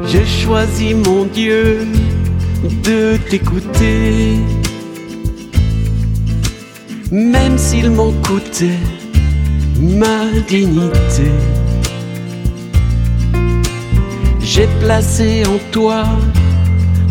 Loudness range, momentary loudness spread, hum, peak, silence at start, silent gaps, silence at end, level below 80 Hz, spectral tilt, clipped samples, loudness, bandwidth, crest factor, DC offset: 2 LU; 7 LU; none; 0 dBFS; 0 s; none; 0 s; -18 dBFS; -6 dB/octave; under 0.1%; -14 LUFS; 16.5 kHz; 12 dB; under 0.1%